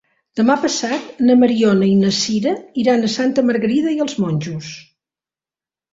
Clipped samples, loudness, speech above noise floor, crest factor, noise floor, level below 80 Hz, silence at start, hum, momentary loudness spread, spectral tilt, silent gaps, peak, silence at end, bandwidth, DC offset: under 0.1%; -16 LUFS; over 74 dB; 16 dB; under -90 dBFS; -58 dBFS; 0.35 s; none; 11 LU; -5 dB/octave; none; -2 dBFS; 1.1 s; 7.8 kHz; under 0.1%